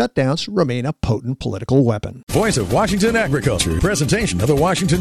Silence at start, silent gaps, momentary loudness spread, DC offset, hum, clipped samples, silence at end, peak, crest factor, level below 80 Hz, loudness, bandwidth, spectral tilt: 0 s; 2.23-2.27 s; 6 LU; under 0.1%; none; under 0.1%; 0 s; -4 dBFS; 14 dB; -34 dBFS; -18 LUFS; 14 kHz; -5 dB/octave